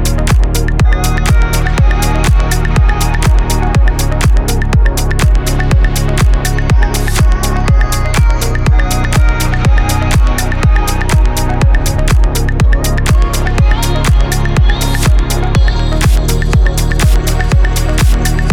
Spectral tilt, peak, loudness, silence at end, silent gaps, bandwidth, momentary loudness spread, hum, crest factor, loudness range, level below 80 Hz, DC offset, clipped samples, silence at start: -5 dB/octave; 0 dBFS; -12 LUFS; 0 s; none; 16 kHz; 2 LU; none; 8 dB; 0 LU; -10 dBFS; under 0.1%; under 0.1%; 0 s